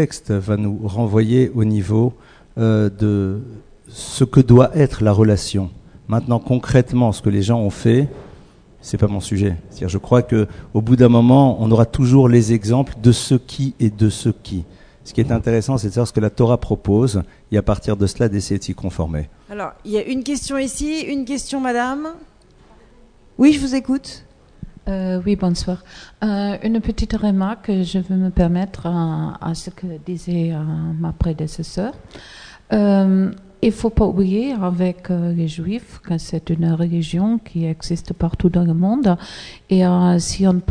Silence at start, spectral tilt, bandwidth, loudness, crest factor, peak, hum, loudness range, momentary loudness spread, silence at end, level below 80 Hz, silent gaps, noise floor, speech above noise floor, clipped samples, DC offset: 0 s; -7 dB/octave; 10 kHz; -18 LUFS; 18 dB; 0 dBFS; none; 8 LU; 13 LU; 0 s; -36 dBFS; none; -48 dBFS; 31 dB; under 0.1%; under 0.1%